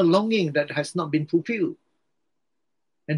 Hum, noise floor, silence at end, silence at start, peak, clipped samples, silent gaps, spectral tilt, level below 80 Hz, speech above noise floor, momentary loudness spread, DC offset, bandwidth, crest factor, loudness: none; -83 dBFS; 0 s; 0 s; -6 dBFS; under 0.1%; none; -6.5 dB/octave; -74 dBFS; 60 dB; 7 LU; under 0.1%; 11.5 kHz; 20 dB; -24 LUFS